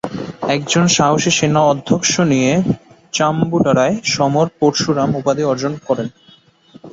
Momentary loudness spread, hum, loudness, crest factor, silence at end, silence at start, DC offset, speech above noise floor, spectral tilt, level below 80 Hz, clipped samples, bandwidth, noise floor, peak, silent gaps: 8 LU; none; -15 LUFS; 14 dB; 0.05 s; 0.05 s; under 0.1%; 34 dB; -4.5 dB/octave; -50 dBFS; under 0.1%; 8 kHz; -49 dBFS; 0 dBFS; none